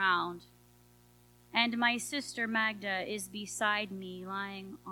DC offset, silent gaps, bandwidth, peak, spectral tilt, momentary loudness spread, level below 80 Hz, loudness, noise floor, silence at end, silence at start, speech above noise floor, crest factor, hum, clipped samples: under 0.1%; none; 19 kHz; -12 dBFS; -2.5 dB/octave; 11 LU; -70 dBFS; -33 LUFS; -62 dBFS; 0 s; 0 s; 27 dB; 24 dB; 60 Hz at -55 dBFS; under 0.1%